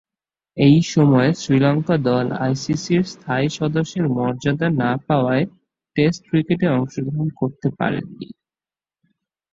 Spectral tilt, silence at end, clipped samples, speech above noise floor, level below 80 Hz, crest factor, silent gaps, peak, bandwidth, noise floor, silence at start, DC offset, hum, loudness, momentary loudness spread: -7 dB/octave; 1.2 s; under 0.1%; over 72 dB; -54 dBFS; 16 dB; none; -2 dBFS; 7.8 kHz; under -90 dBFS; 0.55 s; under 0.1%; none; -19 LUFS; 9 LU